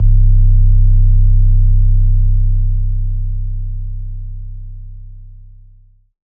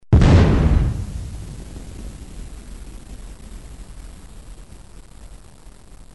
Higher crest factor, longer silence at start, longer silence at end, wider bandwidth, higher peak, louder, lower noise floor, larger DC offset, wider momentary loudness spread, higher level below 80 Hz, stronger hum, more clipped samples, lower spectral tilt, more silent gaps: second, 10 dB vs 18 dB; about the same, 0 s vs 0.1 s; first, 1.1 s vs 0.8 s; second, 0.3 kHz vs 11.5 kHz; about the same, 0 dBFS vs -2 dBFS; about the same, -16 LUFS vs -17 LUFS; about the same, -45 dBFS vs -44 dBFS; second, under 0.1% vs 0.5%; second, 19 LU vs 29 LU; first, -12 dBFS vs -26 dBFS; neither; neither; first, -12.5 dB/octave vs -7.5 dB/octave; neither